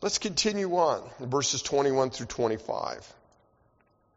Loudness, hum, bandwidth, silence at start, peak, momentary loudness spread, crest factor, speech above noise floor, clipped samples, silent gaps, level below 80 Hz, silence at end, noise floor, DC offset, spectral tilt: -28 LUFS; none; 8 kHz; 0 s; -12 dBFS; 8 LU; 18 dB; 39 dB; under 0.1%; none; -60 dBFS; 1.1 s; -67 dBFS; under 0.1%; -3.5 dB/octave